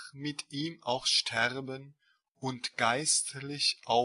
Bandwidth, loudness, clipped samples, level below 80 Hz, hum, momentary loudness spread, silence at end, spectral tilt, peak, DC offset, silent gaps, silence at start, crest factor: 11.5 kHz; -30 LUFS; under 0.1%; -72 dBFS; none; 13 LU; 0 s; -2 dB/octave; -12 dBFS; under 0.1%; none; 0 s; 22 dB